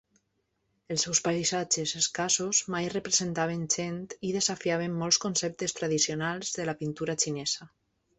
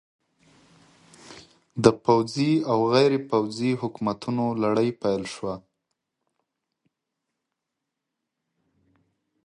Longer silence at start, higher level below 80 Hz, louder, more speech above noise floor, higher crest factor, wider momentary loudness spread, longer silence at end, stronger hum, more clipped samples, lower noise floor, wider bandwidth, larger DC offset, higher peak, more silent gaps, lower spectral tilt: second, 0.9 s vs 1.25 s; about the same, -66 dBFS vs -62 dBFS; second, -28 LUFS vs -24 LUFS; second, 47 dB vs 61 dB; about the same, 22 dB vs 26 dB; second, 7 LU vs 12 LU; second, 0.5 s vs 3.85 s; neither; neither; second, -77 dBFS vs -84 dBFS; second, 8.6 kHz vs 11 kHz; neither; second, -8 dBFS vs -2 dBFS; neither; second, -2.5 dB/octave vs -6.5 dB/octave